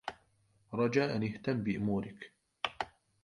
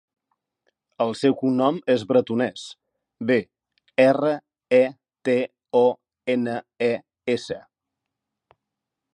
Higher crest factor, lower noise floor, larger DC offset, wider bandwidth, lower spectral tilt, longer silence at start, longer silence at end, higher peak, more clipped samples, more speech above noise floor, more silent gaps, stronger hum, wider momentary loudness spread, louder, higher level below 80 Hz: about the same, 22 dB vs 20 dB; second, -71 dBFS vs -84 dBFS; neither; first, 11 kHz vs 9.8 kHz; about the same, -6.5 dB/octave vs -6 dB/octave; second, 0.05 s vs 1 s; second, 0.35 s vs 1.6 s; second, -14 dBFS vs -4 dBFS; neither; second, 38 dB vs 63 dB; neither; neither; first, 15 LU vs 11 LU; second, -35 LUFS vs -23 LUFS; first, -64 dBFS vs -70 dBFS